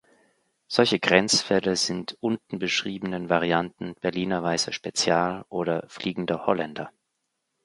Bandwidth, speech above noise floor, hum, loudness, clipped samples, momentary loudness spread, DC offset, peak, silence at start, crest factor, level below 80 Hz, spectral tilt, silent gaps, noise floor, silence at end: 11.5 kHz; 53 dB; none; -25 LUFS; under 0.1%; 10 LU; under 0.1%; -2 dBFS; 0.7 s; 24 dB; -62 dBFS; -3.5 dB/octave; none; -79 dBFS; 0.75 s